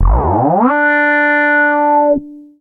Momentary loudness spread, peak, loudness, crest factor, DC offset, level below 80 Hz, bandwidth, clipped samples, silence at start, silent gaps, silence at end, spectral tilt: 3 LU; 0 dBFS; -11 LUFS; 12 dB; under 0.1%; -20 dBFS; 4.7 kHz; under 0.1%; 0 s; none; 0.2 s; -9.5 dB/octave